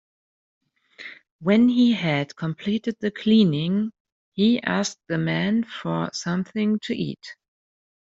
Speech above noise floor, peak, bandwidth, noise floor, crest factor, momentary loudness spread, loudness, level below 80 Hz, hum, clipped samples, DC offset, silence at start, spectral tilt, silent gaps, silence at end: 22 dB; -6 dBFS; 7.8 kHz; -44 dBFS; 18 dB; 17 LU; -23 LUFS; -64 dBFS; none; under 0.1%; under 0.1%; 1 s; -6 dB/octave; 1.31-1.39 s, 4.00-4.05 s, 4.12-4.32 s; 0.65 s